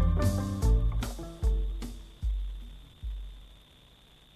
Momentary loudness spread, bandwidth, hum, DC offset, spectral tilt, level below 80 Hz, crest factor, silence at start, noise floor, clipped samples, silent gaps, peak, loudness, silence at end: 18 LU; 14 kHz; none; under 0.1%; -6.5 dB/octave; -32 dBFS; 16 dB; 0 s; -57 dBFS; under 0.1%; none; -14 dBFS; -33 LUFS; 0.8 s